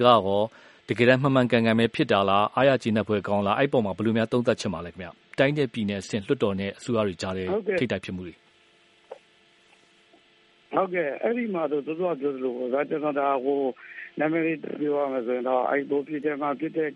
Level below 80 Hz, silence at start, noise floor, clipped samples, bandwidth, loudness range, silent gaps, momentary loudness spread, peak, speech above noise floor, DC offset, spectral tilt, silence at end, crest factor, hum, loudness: -64 dBFS; 0 s; -60 dBFS; under 0.1%; 11.5 kHz; 9 LU; none; 10 LU; -4 dBFS; 35 dB; under 0.1%; -6.5 dB/octave; 0 s; 22 dB; none; -25 LUFS